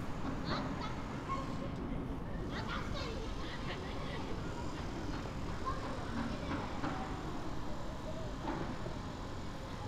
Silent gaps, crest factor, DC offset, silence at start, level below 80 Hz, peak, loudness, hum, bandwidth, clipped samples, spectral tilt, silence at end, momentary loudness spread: none; 18 dB; under 0.1%; 0 s; -46 dBFS; -22 dBFS; -41 LUFS; none; 14 kHz; under 0.1%; -6 dB/octave; 0 s; 4 LU